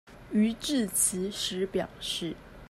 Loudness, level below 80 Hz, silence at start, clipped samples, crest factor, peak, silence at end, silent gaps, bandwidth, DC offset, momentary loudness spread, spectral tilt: -29 LUFS; -56 dBFS; 0.05 s; under 0.1%; 18 dB; -12 dBFS; 0 s; none; 14.5 kHz; under 0.1%; 8 LU; -3 dB/octave